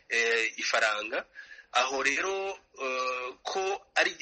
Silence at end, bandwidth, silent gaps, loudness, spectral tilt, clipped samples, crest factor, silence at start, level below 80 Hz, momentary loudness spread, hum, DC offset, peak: 0.05 s; 8.4 kHz; none; -29 LUFS; 0 dB/octave; under 0.1%; 20 dB; 0.1 s; -72 dBFS; 10 LU; none; under 0.1%; -10 dBFS